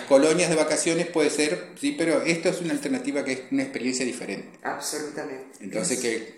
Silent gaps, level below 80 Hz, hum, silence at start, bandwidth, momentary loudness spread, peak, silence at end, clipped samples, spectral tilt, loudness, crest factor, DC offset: none; -70 dBFS; none; 0 s; 15.5 kHz; 12 LU; -4 dBFS; 0 s; under 0.1%; -3.5 dB/octave; -25 LUFS; 20 dB; under 0.1%